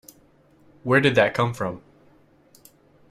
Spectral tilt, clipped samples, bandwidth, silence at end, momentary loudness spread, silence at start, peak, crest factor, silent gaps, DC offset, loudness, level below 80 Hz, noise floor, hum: -6 dB/octave; under 0.1%; 15 kHz; 1.3 s; 17 LU; 0.85 s; -4 dBFS; 22 dB; none; under 0.1%; -21 LUFS; -60 dBFS; -57 dBFS; none